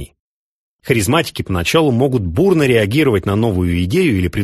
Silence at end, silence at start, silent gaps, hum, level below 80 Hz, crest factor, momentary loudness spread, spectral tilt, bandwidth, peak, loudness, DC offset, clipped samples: 0 s; 0 s; 0.20-0.79 s; none; -36 dBFS; 14 dB; 5 LU; -6 dB/octave; 13 kHz; 0 dBFS; -15 LUFS; under 0.1%; under 0.1%